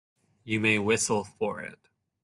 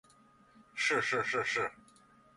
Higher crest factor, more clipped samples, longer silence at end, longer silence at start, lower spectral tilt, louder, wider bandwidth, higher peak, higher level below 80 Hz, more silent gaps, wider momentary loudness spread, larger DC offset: about the same, 20 dB vs 18 dB; neither; about the same, 0.5 s vs 0.6 s; second, 0.45 s vs 0.75 s; about the same, -3.5 dB/octave vs -2.5 dB/octave; first, -27 LUFS vs -32 LUFS; about the same, 12.5 kHz vs 11.5 kHz; first, -10 dBFS vs -18 dBFS; first, -68 dBFS vs -74 dBFS; neither; first, 13 LU vs 8 LU; neither